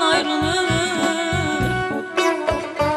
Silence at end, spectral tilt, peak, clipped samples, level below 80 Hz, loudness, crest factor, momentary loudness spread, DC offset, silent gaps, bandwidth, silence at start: 0 s; -4 dB/octave; -4 dBFS; under 0.1%; -40 dBFS; -20 LUFS; 16 dB; 4 LU; under 0.1%; none; 14 kHz; 0 s